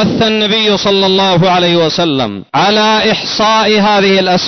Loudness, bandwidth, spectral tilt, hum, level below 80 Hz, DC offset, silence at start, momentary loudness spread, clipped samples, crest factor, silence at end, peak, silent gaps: -10 LUFS; 6.4 kHz; -4.5 dB/octave; none; -44 dBFS; 0.3%; 0 s; 4 LU; under 0.1%; 8 dB; 0 s; -2 dBFS; none